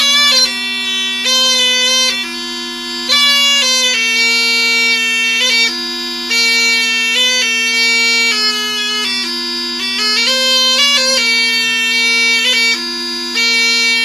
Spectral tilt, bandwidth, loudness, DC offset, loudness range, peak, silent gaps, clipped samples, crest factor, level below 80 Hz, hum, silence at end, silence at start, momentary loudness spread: 2 dB/octave; 15.5 kHz; -10 LUFS; under 0.1%; 2 LU; -2 dBFS; none; under 0.1%; 12 dB; -54 dBFS; none; 0 s; 0 s; 8 LU